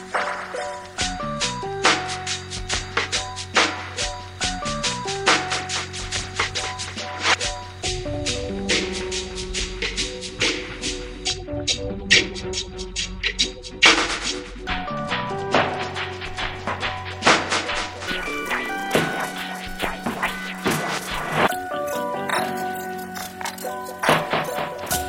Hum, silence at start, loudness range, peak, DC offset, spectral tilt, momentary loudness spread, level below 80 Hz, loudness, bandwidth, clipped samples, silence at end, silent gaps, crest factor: none; 0 s; 5 LU; 0 dBFS; under 0.1%; -2.5 dB/octave; 9 LU; -40 dBFS; -23 LUFS; 16.5 kHz; under 0.1%; 0 s; none; 24 dB